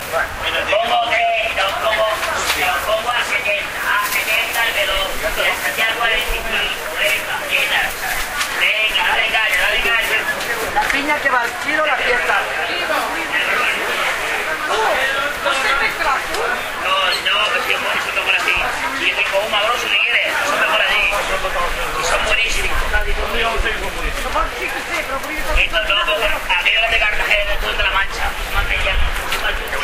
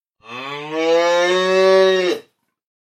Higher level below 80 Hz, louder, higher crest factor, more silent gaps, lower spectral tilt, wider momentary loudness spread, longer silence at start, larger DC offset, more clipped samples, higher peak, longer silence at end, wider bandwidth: first, -30 dBFS vs -82 dBFS; about the same, -16 LUFS vs -16 LUFS; about the same, 18 dB vs 16 dB; neither; second, -1.5 dB/octave vs -4 dB/octave; second, 6 LU vs 16 LU; second, 0 s vs 0.3 s; neither; neither; about the same, 0 dBFS vs -2 dBFS; second, 0 s vs 0.6 s; first, 16 kHz vs 9.8 kHz